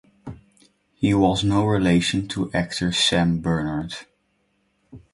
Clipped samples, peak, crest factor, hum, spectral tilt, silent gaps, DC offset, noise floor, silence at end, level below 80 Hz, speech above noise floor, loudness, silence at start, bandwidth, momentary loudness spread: under 0.1%; -4 dBFS; 20 dB; none; -5 dB/octave; none; under 0.1%; -68 dBFS; 0.15 s; -44 dBFS; 47 dB; -21 LUFS; 0.25 s; 11.5 kHz; 17 LU